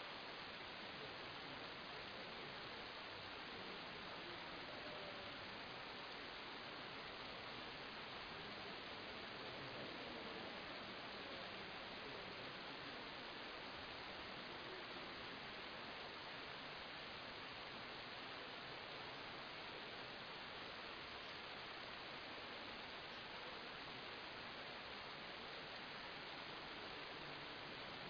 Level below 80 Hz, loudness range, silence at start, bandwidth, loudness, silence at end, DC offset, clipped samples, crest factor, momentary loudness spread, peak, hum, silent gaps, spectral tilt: -74 dBFS; 1 LU; 0 s; 5.4 kHz; -51 LUFS; 0 s; under 0.1%; under 0.1%; 16 dB; 1 LU; -36 dBFS; none; none; -1 dB/octave